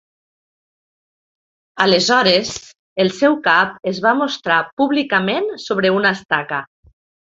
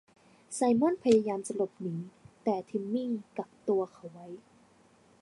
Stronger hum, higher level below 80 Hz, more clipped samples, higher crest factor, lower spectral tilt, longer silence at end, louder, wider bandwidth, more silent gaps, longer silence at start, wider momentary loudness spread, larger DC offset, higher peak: neither; first, -60 dBFS vs -74 dBFS; neither; about the same, 18 dB vs 20 dB; second, -4 dB/octave vs -6 dB/octave; second, 0.7 s vs 0.85 s; first, -16 LUFS vs -31 LUFS; second, 8 kHz vs 11.5 kHz; first, 2.79-2.96 s, 4.73-4.77 s, 6.25-6.29 s vs none; first, 1.75 s vs 0.5 s; second, 9 LU vs 22 LU; neither; first, 0 dBFS vs -12 dBFS